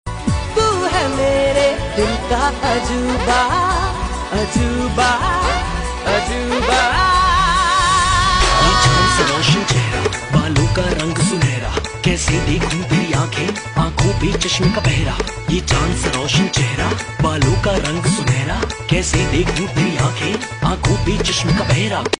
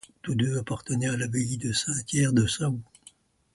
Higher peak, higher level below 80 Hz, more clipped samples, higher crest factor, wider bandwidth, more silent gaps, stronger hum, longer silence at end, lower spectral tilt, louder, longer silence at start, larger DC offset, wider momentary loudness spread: first, -2 dBFS vs -10 dBFS; first, -26 dBFS vs -54 dBFS; neither; about the same, 14 dB vs 18 dB; about the same, 11 kHz vs 11.5 kHz; neither; neither; second, 0.05 s vs 0.7 s; about the same, -4.5 dB/octave vs -4.5 dB/octave; first, -16 LUFS vs -27 LUFS; second, 0.05 s vs 0.25 s; neither; about the same, 7 LU vs 7 LU